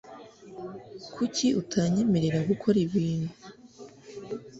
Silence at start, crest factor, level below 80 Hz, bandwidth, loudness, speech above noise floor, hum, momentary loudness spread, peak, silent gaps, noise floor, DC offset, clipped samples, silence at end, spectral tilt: 0.05 s; 18 dB; -60 dBFS; 8 kHz; -27 LUFS; 22 dB; none; 23 LU; -10 dBFS; none; -49 dBFS; under 0.1%; under 0.1%; 0 s; -6 dB/octave